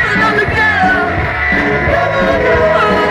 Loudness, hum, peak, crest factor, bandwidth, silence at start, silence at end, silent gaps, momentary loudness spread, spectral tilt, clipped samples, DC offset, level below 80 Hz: -11 LUFS; none; -2 dBFS; 10 dB; 14 kHz; 0 s; 0 s; none; 3 LU; -6 dB/octave; under 0.1%; under 0.1%; -28 dBFS